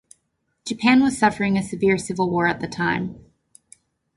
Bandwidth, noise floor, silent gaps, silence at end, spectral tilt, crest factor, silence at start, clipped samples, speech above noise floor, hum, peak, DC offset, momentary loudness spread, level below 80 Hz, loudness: 11.5 kHz; -72 dBFS; none; 0.95 s; -5.5 dB/octave; 18 dB; 0.65 s; under 0.1%; 52 dB; none; -4 dBFS; under 0.1%; 12 LU; -54 dBFS; -21 LUFS